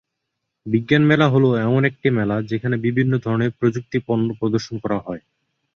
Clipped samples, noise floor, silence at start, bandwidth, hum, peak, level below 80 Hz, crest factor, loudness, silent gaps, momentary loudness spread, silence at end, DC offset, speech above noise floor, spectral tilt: under 0.1%; -78 dBFS; 0.65 s; 6.8 kHz; none; -2 dBFS; -54 dBFS; 18 dB; -19 LUFS; none; 10 LU; 0.6 s; under 0.1%; 59 dB; -8 dB/octave